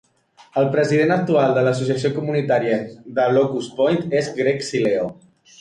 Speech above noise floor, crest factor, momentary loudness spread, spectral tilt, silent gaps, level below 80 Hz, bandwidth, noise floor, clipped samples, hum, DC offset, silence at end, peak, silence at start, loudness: 34 dB; 14 dB; 6 LU; -6.5 dB/octave; none; -60 dBFS; 11 kHz; -53 dBFS; under 0.1%; none; under 0.1%; 0.5 s; -6 dBFS; 0.55 s; -20 LUFS